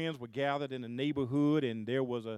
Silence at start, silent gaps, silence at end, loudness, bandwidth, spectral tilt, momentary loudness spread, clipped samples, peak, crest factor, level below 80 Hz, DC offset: 0 s; none; 0 s; -34 LUFS; 9.6 kHz; -7.5 dB/octave; 7 LU; under 0.1%; -18 dBFS; 16 dB; -76 dBFS; under 0.1%